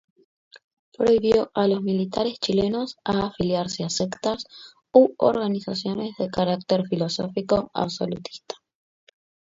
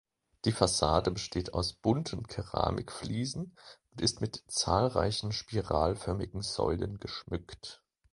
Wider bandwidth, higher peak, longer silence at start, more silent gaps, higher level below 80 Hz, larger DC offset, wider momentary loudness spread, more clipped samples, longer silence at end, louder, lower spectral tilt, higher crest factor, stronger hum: second, 7.8 kHz vs 11.5 kHz; first, -4 dBFS vs -8 dBFS; about the same, 0.55 s vs 0.45 s; first, 0.64-0.92 s vs none; second, -56 dBFS vs -48 dBFS; neither; about the same, 11 LU vs 12 LU; neither; first, 1 s vs 0.4 s; first, -23 LUFS vs -32 LUFS; about the same, -5.5 dB/octave vs -5 dB/octave; about the same, 22 dB vs 24 dB; neither